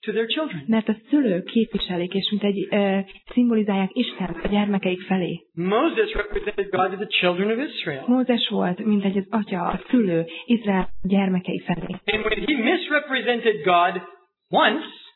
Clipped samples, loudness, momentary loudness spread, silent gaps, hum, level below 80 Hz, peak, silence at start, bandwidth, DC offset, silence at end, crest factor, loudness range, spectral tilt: under 0.1%; -22 LUFS; 7 LU; none; none; -46 dBFS; -6 dBFS; 0 s; 4.3 kHz; under 0.1%; 0.05 s; 16 dB; 2 LU; -9 dB/octave